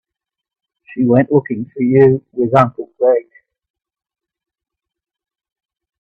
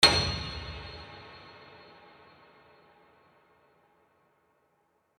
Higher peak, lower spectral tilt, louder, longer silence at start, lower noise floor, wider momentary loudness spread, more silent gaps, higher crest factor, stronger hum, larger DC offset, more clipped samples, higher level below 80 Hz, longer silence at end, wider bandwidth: first, 0 dBFS vs -4 dBFS; first, -10 dB/octave vs -2.5 dB/octave; first, -14 LUFS vs -30 LUFS; first, 0.9 s vs 0 s; first, -84 dBFS vs -72 dBFS; second, 8 LU vs 26 LU; neither; second, 18 dB vs 30 dB; neither; neither; neither; second, -56 dBFS vs -50 dBFS; second, 2.8 s vs 3.55 s; second, 5.4 kHz vs 18.5 kHz